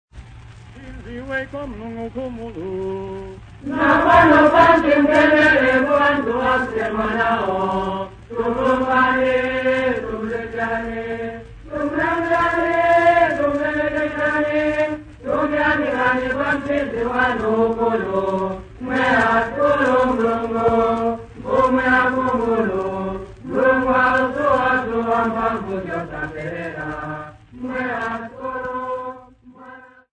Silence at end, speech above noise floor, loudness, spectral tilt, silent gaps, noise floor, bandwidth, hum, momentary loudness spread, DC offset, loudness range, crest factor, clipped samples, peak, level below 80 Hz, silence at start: 0.35 s; 25 dB; -18 LUFS; -6.5 dB/octave; none; -44 dBFS; 9.6 kHz; none; 16 LU; under 0.1%; 12 LU; 18 dB; under 0.1%; 0 dBFS; -42 dBFS; 0.15 s